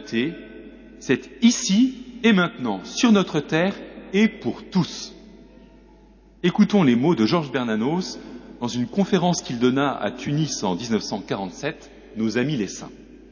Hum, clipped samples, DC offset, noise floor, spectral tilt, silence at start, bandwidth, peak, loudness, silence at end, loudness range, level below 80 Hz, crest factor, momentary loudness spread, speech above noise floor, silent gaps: none; under 0.1%; under 0.1%; -51 dBFS; -5 dB/octave; 0 s; 7.2 kHz; -6 dBFS; -22 LUFS; 0.15 s; 5 LU; -54 dBFS; 16 dB; 17 LU; 29 dB; none